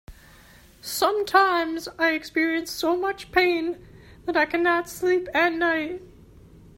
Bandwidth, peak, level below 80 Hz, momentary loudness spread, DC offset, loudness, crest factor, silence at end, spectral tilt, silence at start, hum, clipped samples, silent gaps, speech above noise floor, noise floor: 16.5 kHz; -4 dBFS; -54 dBFS; 12 LU; under 0.1%; -23 LUFS; 20 dB; 0.7 s; -3 dB/octave; 0.1 s; none; under 0.1%; none; 28 dB; -51 dBFS